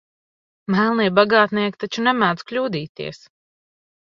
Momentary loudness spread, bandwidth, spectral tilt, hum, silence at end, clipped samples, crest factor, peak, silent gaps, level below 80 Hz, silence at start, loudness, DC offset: 16 LU; 7.4 kHz; -6 dB/octave; none; 1 s; under 0.1%; 20 dB; 0 dBFS; 2.89-2.95 s; -64 dBFS; 0.7 s; -19 LUFS; under 0.1%